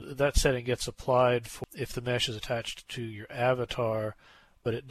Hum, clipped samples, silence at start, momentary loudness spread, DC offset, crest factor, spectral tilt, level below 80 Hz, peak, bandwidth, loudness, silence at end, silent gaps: none; under 0.1%; 0 s; 13 LU; under 0.1%; 18 dB; -4.5 dB/octave; -40 dBFS; -12 dBFS; 14 kHz; -30 LUFS; 0 s; none